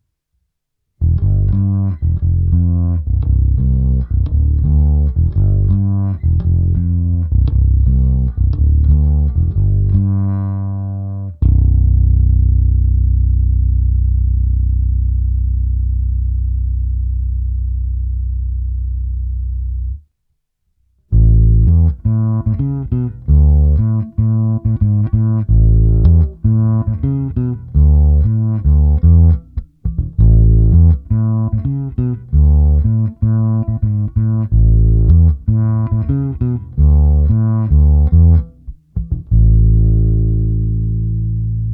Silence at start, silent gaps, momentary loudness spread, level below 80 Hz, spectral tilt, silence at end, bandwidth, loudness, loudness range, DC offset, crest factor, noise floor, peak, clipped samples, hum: 1 s; none; 9 LU; -16 dBFS; -14.5 dB/octave; 0 s; 1.6 kHz; -15 LUFS; 5 LU; under 0.1%; 12 dB; -72 dBFS; 0 dBFS; under 0.1%; none